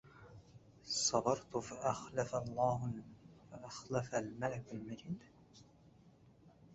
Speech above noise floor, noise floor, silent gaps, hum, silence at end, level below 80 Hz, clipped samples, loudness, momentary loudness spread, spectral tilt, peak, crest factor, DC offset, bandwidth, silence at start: 25 dB; -65 dBFS; none; none; 0 s; -68 dBFS; under 0.1%; -40 LUFS; 24 LU; -4.5 dB/octave; -18 dBFS; 24 dB; under 0.1%; 8 kHz; 0.05 s